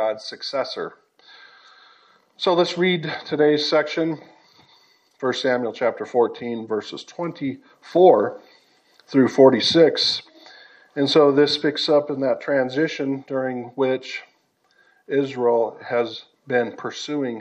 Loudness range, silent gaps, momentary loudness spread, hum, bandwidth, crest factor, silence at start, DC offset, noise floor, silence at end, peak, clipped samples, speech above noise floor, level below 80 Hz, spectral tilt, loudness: 7 LU; none; 15 LU; none; 9 kHz; 20 dB; 0 s; under 0.1%; -63 dBFS; 0 s; -2 dBFS; under 0.1%; 43 dB; -74 dBFS; -5 dB/octave; -21 LUFS